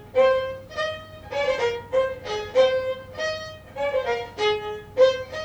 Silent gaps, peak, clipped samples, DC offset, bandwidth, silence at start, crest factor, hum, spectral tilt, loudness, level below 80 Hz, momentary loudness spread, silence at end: none; -6 dBFS; under 0.1%; under 0.1%; 8.6 kHz; 0 s; 18 dB; none; -3.5 dB/octave; -24 LUFS; -52 dBFS; 11 LU; 0 s